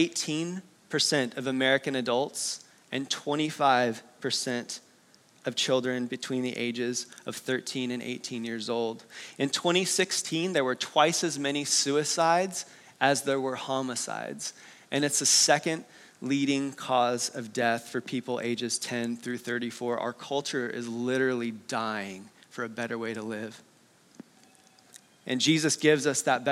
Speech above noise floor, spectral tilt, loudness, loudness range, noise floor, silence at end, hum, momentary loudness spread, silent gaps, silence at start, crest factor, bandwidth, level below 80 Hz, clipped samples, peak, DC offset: 32 dB; -3 dB/octave; -28 LUFS; 6 LU; -60 dBFS; 0 s; none; 12 LU; none; 0 s; 22 dB; 16 kHz; -86 dBFS; under 0.1%; -8 dBFS; under 0.1%